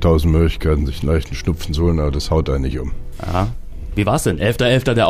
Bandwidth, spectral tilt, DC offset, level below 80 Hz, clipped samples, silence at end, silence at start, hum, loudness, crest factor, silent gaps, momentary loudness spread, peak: 15.5 kHz; -6.5 dB/octave; under 0.1%; -24 dBFS; under 0.1%; 0 s; 0 s; none; -18 LUFS; 14 dB; none; 11 LU; -4 dBFS